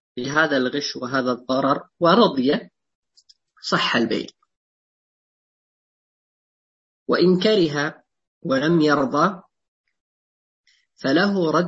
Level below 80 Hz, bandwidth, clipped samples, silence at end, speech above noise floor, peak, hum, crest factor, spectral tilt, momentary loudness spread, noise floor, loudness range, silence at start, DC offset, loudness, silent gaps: -66 dBFS; 8 kHz; under 0.1%; 0 s; 39 dB; -2 dBFS; none; 20 dB; -5.5 dB/octave; 11 LU; -58 dBFS; 6 LU; 0.15 s; under 0.1%; -20 LUFS; 2.95-3.03 s, 4.56-7.06 s, 8.27-8.41 s, 9.68-9.84 s, 10.00-10.64 s